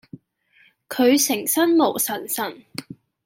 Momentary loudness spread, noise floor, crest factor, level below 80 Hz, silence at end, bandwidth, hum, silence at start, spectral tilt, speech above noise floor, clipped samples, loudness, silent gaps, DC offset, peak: 19 LU; -59 dBFS; 18 dB; -72 dBFS; 0.3 s; 17 kHz; none; 0.15 s; -2.5 dB/octave; 39 dB; under 0.1%; -20 LUFS; none; under 0.1%; -4 dBFS